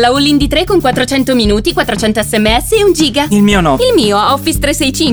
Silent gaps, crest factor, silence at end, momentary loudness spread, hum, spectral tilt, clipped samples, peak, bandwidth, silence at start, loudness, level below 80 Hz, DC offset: none; 10 dB; 0 s; 3 LU; none; -4 dB/octave; under 0.1%; 0 dBFS; over 20 kHz; 0 s; -10 LUFS; -24 dBFS; under 0.1%